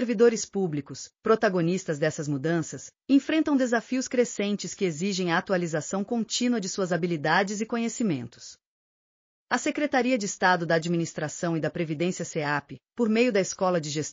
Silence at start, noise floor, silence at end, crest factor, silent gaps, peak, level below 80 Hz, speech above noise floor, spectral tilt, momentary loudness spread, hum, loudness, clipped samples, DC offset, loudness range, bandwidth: 0 s; under -90 dBFS; 0 s; 18 dB; 8.66-9.47 s; -8 dBFS; -70 dBFS; over 64 dB; -4.5 dB/octave; 8 LU; none; -26 LUFS; under 0.1%; under 0.1%; 2 LU; 7.4 kHz